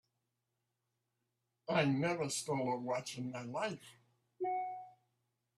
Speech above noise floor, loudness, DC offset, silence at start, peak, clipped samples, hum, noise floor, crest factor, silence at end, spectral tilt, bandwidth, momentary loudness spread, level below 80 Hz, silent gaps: 50 dB; -38 LUFS; under 0.1%; 1.7 s; -18 dBFS; under 0.1%; none; -87 dBFS; 22 dB; 0.65 s; -5 dB/octave; 14.5 kHz; 11 LU; -80 dBFS; none